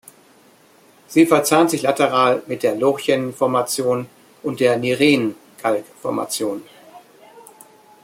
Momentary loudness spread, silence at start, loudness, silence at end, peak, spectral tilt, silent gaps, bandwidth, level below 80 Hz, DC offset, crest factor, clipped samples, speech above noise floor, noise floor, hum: 11 LU; 1.1 s; -18 LUFS; 0.6 s; -2 dBFS; -4.5 dB/octave; none; 16.5 kHz; -66 dBFS; under 0.1%; 18 dB; under 0.1%; 34 dB; -51 dBFS; none